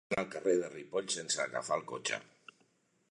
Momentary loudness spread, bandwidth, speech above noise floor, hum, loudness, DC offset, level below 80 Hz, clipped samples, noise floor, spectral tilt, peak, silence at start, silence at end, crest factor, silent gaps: 6 LU; 11 kHz; 37 dB; none; -35 LUFS; under 0.1%; -76 dBFS; under 0.1%; -73 dBFS; -2.5 dB/octave; -18 dBFS; 0.1 s; 0.85 s; 20 dB; none